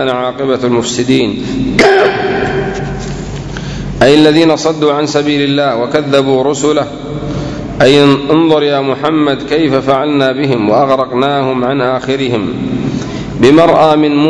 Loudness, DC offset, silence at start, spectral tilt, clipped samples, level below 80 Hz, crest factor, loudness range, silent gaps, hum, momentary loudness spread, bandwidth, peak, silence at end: -11 LUFS; under 0.1%; 0 s; -5.5 dB/octave; 1%; -34 dBFS; 10 dB; 2 LU; none; none; 12 LU; 11 kHz; 0 dBFS; 0 s